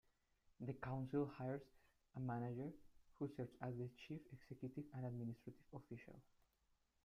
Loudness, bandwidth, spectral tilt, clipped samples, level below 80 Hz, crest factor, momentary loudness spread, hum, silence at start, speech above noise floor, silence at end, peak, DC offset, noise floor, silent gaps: -51 LUFS; 7 kHz; -9 dB/octave; under 0.1%; -76 dBFS; 18 dB; 14 LU; none; 0.6 s; 34 dB; 0.85 s; -32 dBFS; under 0.1%; -83 dBFS; none